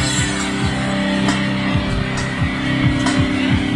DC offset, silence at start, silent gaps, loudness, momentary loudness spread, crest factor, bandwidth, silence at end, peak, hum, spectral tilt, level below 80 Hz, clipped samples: under 0.1%; 0 s; none; -18 LUFS; 3 LU; 14 dB; 11.5 kHz; 0 s; -4 dBFS; none; -5 dB/octave; -32 dBFS; under 0.1%